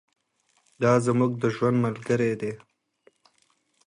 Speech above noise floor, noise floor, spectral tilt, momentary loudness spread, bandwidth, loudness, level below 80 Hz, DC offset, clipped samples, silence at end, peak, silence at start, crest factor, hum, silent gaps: 46 dB; -70 dBFS; -7.5 dB/octave; 10 LU; 11 kHz; -25 LUFS; -64 dBFS; under 0.1%; under 0.1%; 1.3 s; -8 dBFS; 0.8 s; 18 dB; none; none